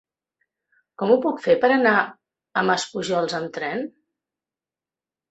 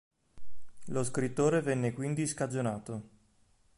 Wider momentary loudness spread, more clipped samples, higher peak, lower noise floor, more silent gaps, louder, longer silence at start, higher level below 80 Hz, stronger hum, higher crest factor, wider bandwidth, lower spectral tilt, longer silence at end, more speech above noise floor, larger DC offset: about the same, 11 LU vs 11 LU; neither; first, -4 dBFS vs -16 dBFS; first, under -90 dBFS vs -68 dBFS; neither; first, -22 LUFS vs -32 LUFS; first, 1 s vs 0.35 s; about the same, -68 dBFS vs -64 dBFS; neither; about the same, 20 dB vs 18 dB; second, 8.2 kHz vs 11.5 kHz; second, -4.5 dB/octave vs -6 dB/octave; first, 1.4 s vs 0.7 s; first, over 69 dB vs 36 dB; neither